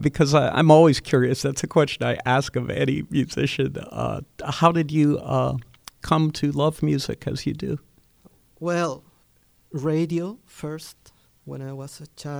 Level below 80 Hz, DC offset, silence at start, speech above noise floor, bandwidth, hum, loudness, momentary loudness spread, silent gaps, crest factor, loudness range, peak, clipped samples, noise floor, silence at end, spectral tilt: -50 dBFS; under 0.1%; 0 s; 39 dB; over 20 kHz; none; -22 LUFS; 17 LU; none; 22 dB; 9 LU; 0 dBFS; under 0.1%; -61 dBFS; 0 s; -6 dB/octave